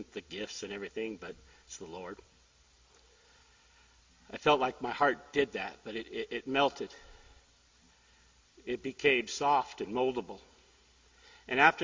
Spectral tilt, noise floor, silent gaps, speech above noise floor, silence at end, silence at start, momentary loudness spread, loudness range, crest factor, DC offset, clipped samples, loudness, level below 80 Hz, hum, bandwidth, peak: -3.5 dB/octave; -65 dBFS; none; 32 dB; 0 s; 0 s; 20 LU; 12 LU; 26 dB; under 0.1%; under 0.1%; -32 LUFS; -66 dBFS; none; 7.6 kHz; -8 dBFS